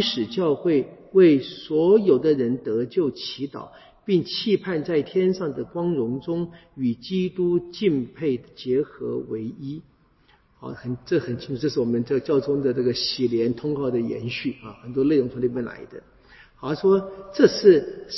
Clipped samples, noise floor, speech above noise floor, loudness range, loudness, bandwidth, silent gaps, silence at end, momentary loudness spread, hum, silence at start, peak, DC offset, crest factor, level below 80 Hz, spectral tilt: under 0.1%; -59 dBFS; 36 dB; 7 LU; -23 LUFS; 6 kHz; none; 0 s; 15 LU; none; 0 s; -2 dBFS; under 0.1%; 20 dB; -58 dBFS; -7 dB/octave